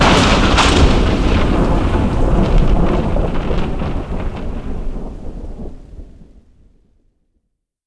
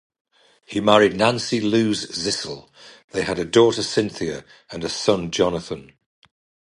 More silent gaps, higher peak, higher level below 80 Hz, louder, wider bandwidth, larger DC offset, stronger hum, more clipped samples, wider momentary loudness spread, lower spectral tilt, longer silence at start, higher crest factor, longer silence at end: second, none vs 3.04-3.08 s; about the same, 0 dBFS vs 0 dBFS; first, -18 dBFS vs -52 dBFS; first, -16 LUFS vs -21 LUFS; about the same, 11 kHz vs 11.5 kHz; neither; neither; neither; first, 20 LU vs 16 LU; about the same, -5.5 dB/octave vs -4.5 dB/octave; second, 0 s vs 0.7 s; second, 14 dB vs 22 dB; first, 1.65 s vs 0.95 s